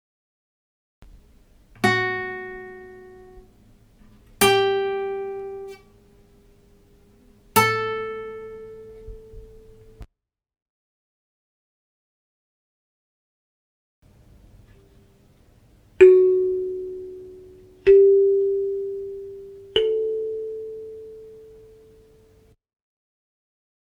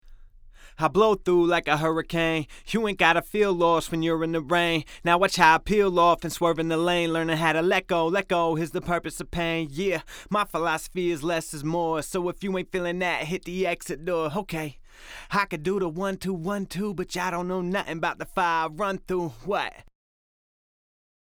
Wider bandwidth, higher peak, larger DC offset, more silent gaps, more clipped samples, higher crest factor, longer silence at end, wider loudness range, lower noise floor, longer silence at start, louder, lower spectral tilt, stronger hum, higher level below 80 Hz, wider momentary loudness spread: about the same, over 20 kHz vs over 20 kHz; about the same, -2 dBFS vs -4 dBFS; neither; first, 10.62-14.02 s vs none; neither; about the same, 24 dB vs 22 dB; first, 2.45 s vs 1.4 s; first, 11 LU vs 7 LU; first, -61 dBFS vs -48 dBFS; first, 1 s vs 0.05 s; first, -20 LUFS vs -25 LUFS; about the same, -4.5 dB/octave vs -5 dB/octave; neither; second, -54 dBFS vs -48 dBFS; first, 27 LU vs 9 LU